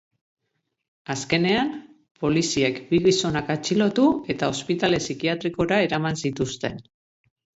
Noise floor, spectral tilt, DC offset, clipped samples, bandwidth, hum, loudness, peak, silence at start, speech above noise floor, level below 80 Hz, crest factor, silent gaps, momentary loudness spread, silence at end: -77 dBFS; -5 dB/octave; under 0.1%; under 0.1%; 8.2 kHz; none; -23 LUFS; -6 dBFS; 1.1 s; 55 dB; -54 dBFS; 18 dB; 2.11-2.15 s; 11 LU; 0.8 s